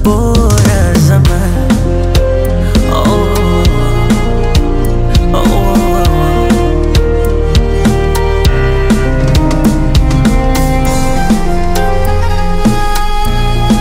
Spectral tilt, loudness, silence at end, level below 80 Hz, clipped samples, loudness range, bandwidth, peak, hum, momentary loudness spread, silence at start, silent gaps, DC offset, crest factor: -6 dB/octave; -11 LUFS; 0 s; -12 dBFS; under 0.1%; 2 LU; 16.5 kHz; 0 dBFS; none; 5 LU; 0 s; none; under 0.1%; 8 dB